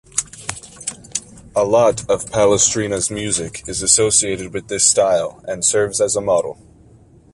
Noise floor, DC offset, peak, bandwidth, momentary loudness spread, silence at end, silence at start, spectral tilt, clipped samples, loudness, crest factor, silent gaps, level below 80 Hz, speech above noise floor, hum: -47 dBFS; under 0.1%; 0 dBFS; 11.5 kHz; 14 LU; 0.8 s; 0.15 s; -2.5 dB/octave; under 0.1%; -16 LUFS; 18 dB; none; -46 dBFS; 30 dB; none